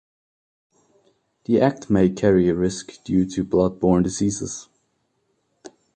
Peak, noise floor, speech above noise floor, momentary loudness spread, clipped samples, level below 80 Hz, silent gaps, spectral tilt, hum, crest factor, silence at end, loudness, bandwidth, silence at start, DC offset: -4 dBFS; -70 dBFS; 50 dB; 13 LU; under 0.1%; -46 dBFS; none; -6.5 dB/octave; none; 20 dB; 0.25 s; -21 LUFS; 9.4 kHz; 1.5 s; under 0.1%